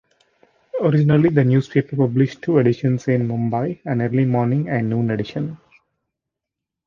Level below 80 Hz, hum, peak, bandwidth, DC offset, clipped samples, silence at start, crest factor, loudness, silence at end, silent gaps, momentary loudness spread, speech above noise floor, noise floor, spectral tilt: -56 dBFS; none; -2 dBFS; 7 kHz; under 0.1%; under 0.1%; 0.75 s; 18 dB; -19 LUFS; 1.3 s; none; 8 LU; 66 dB; -84 dBFS; -9 dB/octave